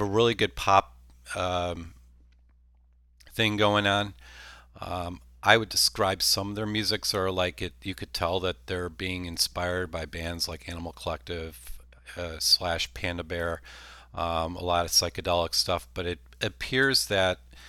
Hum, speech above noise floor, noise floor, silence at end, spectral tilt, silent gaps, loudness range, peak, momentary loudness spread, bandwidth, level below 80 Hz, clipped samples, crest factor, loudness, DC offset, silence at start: 60 Hz at -55 dBFS; 32 dB; -60 dBFS; 0 s; -3 dB/octave; none; 5 LU; -2 dBFS; 15 LU; 18.5 kHz; -48 dBFS; under 0.1%; 28 dB; -27 LUFS; under 0.1%; 0 s